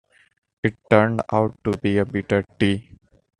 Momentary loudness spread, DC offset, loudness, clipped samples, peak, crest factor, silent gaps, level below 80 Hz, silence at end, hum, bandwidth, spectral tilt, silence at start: 9 LU; under 0.1%; -22 LUFS; under 0.1%; -2 dBFS; 20 dB; none; -54 dBFS; 0.6 s; none; 10.5 kHz; -7.5 dB/octave; 0.65 s